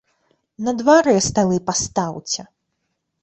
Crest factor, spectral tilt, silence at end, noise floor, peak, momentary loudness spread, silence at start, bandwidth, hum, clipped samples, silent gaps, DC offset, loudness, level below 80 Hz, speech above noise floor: 16 dB; -4 dB/octave; 0.8 s; -74 dBFS; -4 dBFS; 12 LU; 0.6 s; 8.4 kHz; none; under 0.1%; none; under 0.1%; -18 LUFS; -50 dBFS; 56 dB